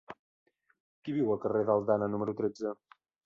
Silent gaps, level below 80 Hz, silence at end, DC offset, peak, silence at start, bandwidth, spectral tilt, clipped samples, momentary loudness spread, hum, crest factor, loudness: 0.19-0.46 s, 0.80-1.02 s; -70 dBFS; 0.5 s; under 0.1%; -14 dBFS; 0.1 s; 7.4 kHz; -8.5 dB/octave; under 0.1%; 20 LU; none; 20 dB; -31 LUFS